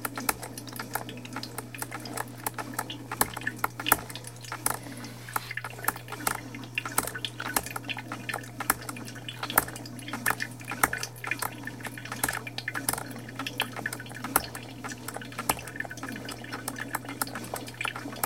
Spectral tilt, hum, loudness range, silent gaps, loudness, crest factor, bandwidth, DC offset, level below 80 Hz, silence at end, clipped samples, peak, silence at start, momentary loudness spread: -2.5 dB/octave; none; 4 LU; none; -32 LUFS; 32 dB; 17 kHz; 0.1%; -58 dBFS; 0 s; under 0.1%; -2 dBFS; 0 s; 10 LU